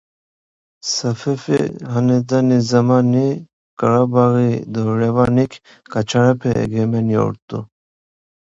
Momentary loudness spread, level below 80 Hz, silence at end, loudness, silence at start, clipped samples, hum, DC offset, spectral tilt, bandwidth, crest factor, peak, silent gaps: 9 LU; -48 dBFS; 0.85 s; -17 LUFS; 0.85 s; under 0.1%; none; under 0.1%; -6.5 dB/octave; 7.8 kHz; 16 dB; 0 dBFS; 3.53-3.77 s, 7.42-7.48 s